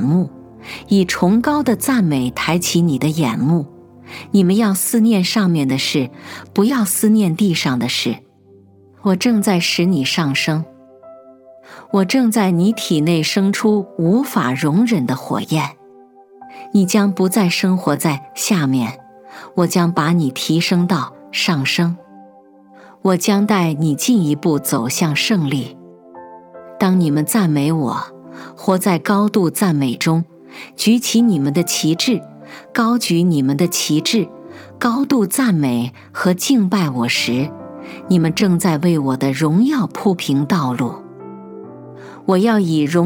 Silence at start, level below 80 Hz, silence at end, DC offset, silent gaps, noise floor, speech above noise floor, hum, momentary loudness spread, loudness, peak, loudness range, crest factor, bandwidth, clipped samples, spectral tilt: 0 s; -58 dBFS; 0 s; under 0.1%; none; -47 dBFS; 32 dB; none; 12 LU; -16 LUFS; -2 dBFS; 2 LU; 16 dB; 19 kHz; under 0.1%; -5 dB/octave